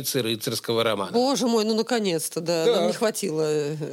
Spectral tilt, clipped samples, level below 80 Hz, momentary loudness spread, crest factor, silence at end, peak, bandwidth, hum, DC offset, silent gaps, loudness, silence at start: -4 dB/octave; under 0.1%; -76 dBFS; 4 LU; 14 dB; 0 s; -10 dBFS; 17 kHz; none; under 0.1%; none; -24 LUFS; 0 s